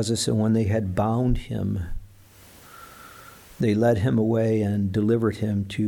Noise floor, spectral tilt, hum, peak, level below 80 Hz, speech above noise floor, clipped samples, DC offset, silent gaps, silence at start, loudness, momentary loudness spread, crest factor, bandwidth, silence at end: -50 dBFS; -6.5 dB/octave; none; -10 dBFS; -40 dBFS; 28 dB; under 0.1%; under 0.1%; none; 0 s; -23 LUFS; 22 LU; 14 dB; 18.5 kHz; 0 s